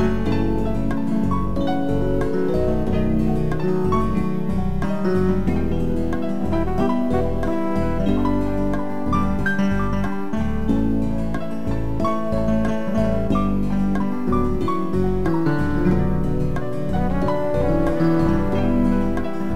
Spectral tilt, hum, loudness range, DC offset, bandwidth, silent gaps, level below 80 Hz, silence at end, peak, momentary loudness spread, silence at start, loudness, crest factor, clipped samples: -8.5 dB/octave; none; 2 LU; 6%; 13.5 kHz; none; -30 dBFS; 0 s; -6 dBFS; 4 LU; 0 s; -22 LUFS; 14 dB; under 0.1%